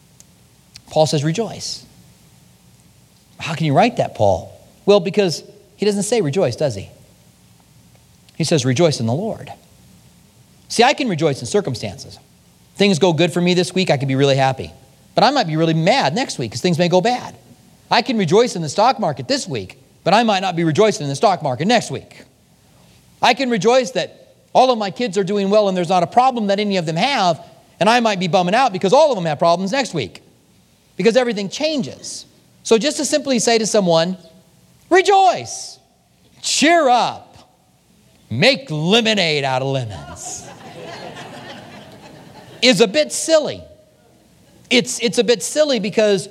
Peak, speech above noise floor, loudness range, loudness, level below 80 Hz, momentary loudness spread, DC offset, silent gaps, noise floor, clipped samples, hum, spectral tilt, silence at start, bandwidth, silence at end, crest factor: 0 dBFS; 38 dB; 5 LU; -17 LUFS; -58 dBFS; 15 LU; under 0.1%; none; -55 dBFS; under 0.1%; none; -4.5 dB/octave; 0.9 s; 15 kHz; 0 s; 18 dB